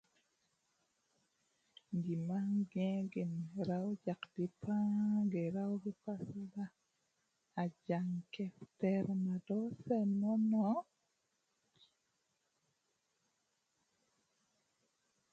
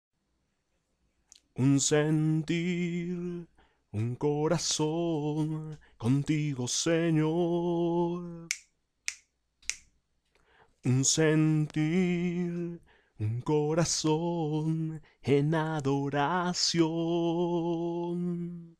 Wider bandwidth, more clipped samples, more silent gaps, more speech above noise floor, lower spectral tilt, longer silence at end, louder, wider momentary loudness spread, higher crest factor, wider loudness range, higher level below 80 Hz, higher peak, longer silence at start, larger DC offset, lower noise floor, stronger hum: second, 7.6 kHz vs 13.5 kHz; neither; neither; about the same, 45 dB vs 48 dB; first, -9 dB/octave vs -5 dB/octave; first, 4.5 s vs 0.1 s; second, -39 LUFS vs -29 LUFS; about the same, 11 LU vs 12 LU; about the same, 18 dB vs 22 dB; about the same, 5 LU vs 3 LU; second, -82 dBFS vs -62 dBFS; second, -24 dBFS vs -8 dBFS; first, 1.9 s vs 1.55 s; neither; first, -83 dBFS vs -77 dBFS; neither